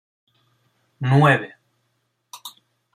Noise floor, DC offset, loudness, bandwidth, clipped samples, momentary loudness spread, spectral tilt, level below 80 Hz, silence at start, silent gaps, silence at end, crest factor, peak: -71 dBFS; under 0.1%; -18 LUFS; 14.5 kHz; under 0.1%; 23 LU; -7 dB/octave; -62 dBFS; 1 s; none; 0.45 s; 20 dB; -2 dBFS